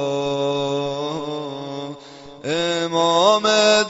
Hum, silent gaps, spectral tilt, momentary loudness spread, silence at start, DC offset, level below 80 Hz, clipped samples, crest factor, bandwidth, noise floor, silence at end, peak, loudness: none; none; -3.5 dB/octave; 17 LU; 0 s; under 0.1%; -60 dBFS; under 0.1%; 18 dB; 8 kHz; -40 dBFS; 0 s; -4 dBFS; -20 LUFS